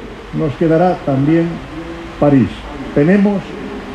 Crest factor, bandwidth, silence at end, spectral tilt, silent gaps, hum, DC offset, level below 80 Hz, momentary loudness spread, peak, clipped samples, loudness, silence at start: 14 dB; 9.4 kHz; 0 s; -8.5 dB/octave; none; none; under 0.1%; -36 dBFS; 15 LU; 0 dBFS; under 0.1%; -14 LUFS; 0 s